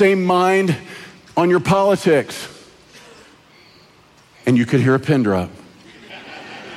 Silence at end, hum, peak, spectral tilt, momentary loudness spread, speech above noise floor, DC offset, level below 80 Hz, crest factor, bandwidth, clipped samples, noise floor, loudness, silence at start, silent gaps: 0 s; none; -4 dBFS; -6.5 dB/octave; 20 LU; 34 dB; under 0.1%; -56 dBFS; 16 dB; 14.5 kHz; under 0.1%; -50 dBFS; -17 LUFS; 0 s; none